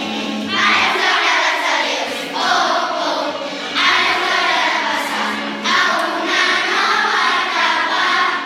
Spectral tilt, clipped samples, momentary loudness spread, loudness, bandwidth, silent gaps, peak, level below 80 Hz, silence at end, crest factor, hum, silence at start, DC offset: -1.5 dB/octave; under 0.1%; 7 LU; -15 LUFS; 16.5 kHz; none; 0 dBFS; -72 dBFS; 0 s; 16 dB; none; 0 s; under 0.1%